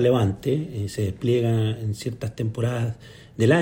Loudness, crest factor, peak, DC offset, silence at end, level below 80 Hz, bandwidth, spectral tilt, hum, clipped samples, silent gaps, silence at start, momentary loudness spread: -25 LUFS; 16 dB; -6 dBFS; under 0.1%; 0 s; -52 dBFS; 16.5 kHz; -7 dB/octave; none; under 0.1%; none; 0 s; 9 LU